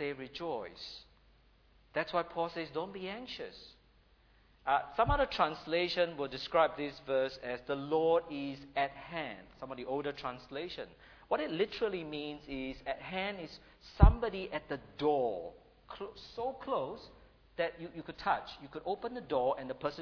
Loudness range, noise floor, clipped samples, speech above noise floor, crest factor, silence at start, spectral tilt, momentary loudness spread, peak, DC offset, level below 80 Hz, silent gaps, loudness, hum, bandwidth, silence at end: 7 LU; -66 dBFS; under 0.1%; 31 dB; 30 dB; 0 s; -4.5 dB/octave; 16 LU; -6 dBFS; under 0.1%; -42 dBFS; none; -36 LUFS; none; 5.4 kHz; 0 s